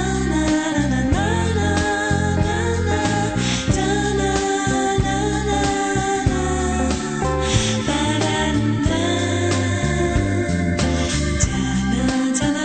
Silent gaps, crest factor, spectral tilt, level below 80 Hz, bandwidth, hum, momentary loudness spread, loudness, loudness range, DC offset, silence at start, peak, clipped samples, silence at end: none; 14 dB; -5 dB/octave; -30 dBFS; 9.2 kHz; none; 2 LU; -20 LUFS; 0 LU; under 0.1%; 0 s; -6 dBFS; under 0.1%; 0 s